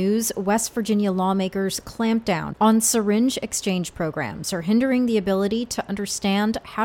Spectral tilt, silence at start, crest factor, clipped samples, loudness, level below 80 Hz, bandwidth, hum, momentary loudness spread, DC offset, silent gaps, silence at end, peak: -4.5 dB/octave; 0 s; 16 dB; under 0.1%; -22 LUFS; -52 dBFS; 17 kHz; none; 8 LU; under 0.1%; none; 0 s; -6 dBFS